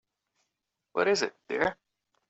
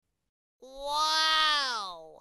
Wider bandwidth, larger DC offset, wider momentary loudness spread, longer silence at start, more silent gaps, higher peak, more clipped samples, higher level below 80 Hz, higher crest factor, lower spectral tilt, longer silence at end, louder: second, 8 kHz vs 14.5 kHz; neither; second, 6 LU vs 16 LU; first, 0.95 s vs 0.6 s; neither; about the same, -12 dBFS vs -12 dBFS; neither; second, -68 dBFS vs -62 dBFS; about the same, 20 dB vs 20 dB; first, -2 dB/octave vs 2 dB/octave; first, 0.55 s vs 0.05 s; second, -29 LUFS vs -26 LUFS